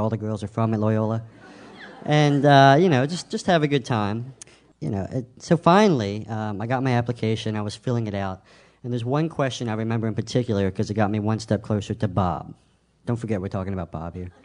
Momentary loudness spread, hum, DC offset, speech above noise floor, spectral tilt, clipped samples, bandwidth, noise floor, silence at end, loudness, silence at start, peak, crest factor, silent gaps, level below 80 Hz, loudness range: 15 LU; none; under 0.1%; 21 dB; -6.5 dB/octave; under 0.1%; 10 kHz; -43 dBFS; 0.15 s; -23 LUFS; 0 s; -2 dBFS; 22 dB; none; -54 dBFS; 7 LU